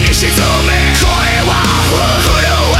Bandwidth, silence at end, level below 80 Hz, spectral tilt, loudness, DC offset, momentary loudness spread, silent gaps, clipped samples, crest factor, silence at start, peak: 16.5 kHz; 0 s; -16 dBFS; -3.5 dB/octave; -10 LUFS; under 0.1%; 1 LU; none; under 0.1%; 10 dB; 0 s; 0 dBFS